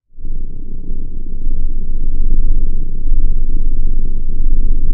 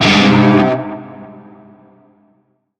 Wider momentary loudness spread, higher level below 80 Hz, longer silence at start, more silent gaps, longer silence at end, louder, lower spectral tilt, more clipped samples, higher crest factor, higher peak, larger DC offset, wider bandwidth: second, 9 LU vs 24 LU; first, -10 dBFS vs -46 dBFS; first, 0.15 s vs 0 s; neither; second, 0 s vs 1.5 s; second, -23 LUFS vs -11 LUFS; first, -16.5 dB/octave vs -5.5 dB/octave; neither; second, 8 dB vs 14 dB; about the same, 0 dBFS vs 0 dBFS; neither; second, 0.5 kHz vs 9.2 kHz